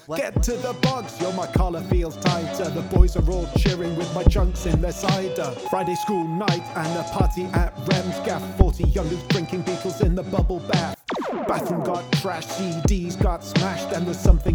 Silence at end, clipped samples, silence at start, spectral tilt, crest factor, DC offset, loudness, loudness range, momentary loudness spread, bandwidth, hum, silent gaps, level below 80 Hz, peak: 0 s; under 0.1%; 0.1 s; -6 dB/octave; 20 dB; under 0.1%; -24 LUFS; 2 LU; 6 LU; 19 kHz; none; none; -26 dBFS; 0 dBFS